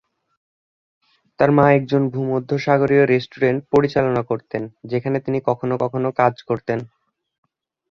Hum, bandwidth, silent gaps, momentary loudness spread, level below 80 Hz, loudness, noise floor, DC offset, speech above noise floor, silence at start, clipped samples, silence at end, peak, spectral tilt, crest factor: none; 6.8 kHz; none; 10 LU; -56 dBFS; -19 LUFS; under -90 dBFS; under 0.1%; over 72 dB; 1.4 s; under 0.1%; 1.05 s; -2 dBFS; -8.5 dB/octave; 18 dB